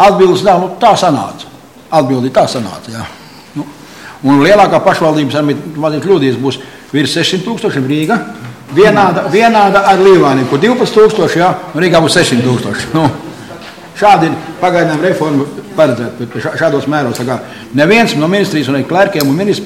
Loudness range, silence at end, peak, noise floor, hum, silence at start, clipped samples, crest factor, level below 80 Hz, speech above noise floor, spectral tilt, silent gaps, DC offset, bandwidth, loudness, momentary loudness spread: 5 LU; 0 s; 0 dBFS; -32 dBFS; none; 0 s; under 0.1%; 10 dB; -46 dBFS; 22 dB; -5.5 dB/octave; none; under 0.1%; 16 kHz; -10 LUFS; 17 LU